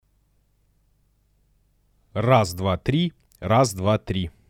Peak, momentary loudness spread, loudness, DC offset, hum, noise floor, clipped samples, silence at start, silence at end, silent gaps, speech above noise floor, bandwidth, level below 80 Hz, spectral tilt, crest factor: -6 dBFS; 9 LU; -22 LUFS; under 0.1%; 50 Hz at -50 dBFS; -64 dBFS; under 0.1%; 2.15 s; 0.2 s; none; 43 dB; 16.5 kHz; -48 dBFS; -6 dB/octave; 20 dB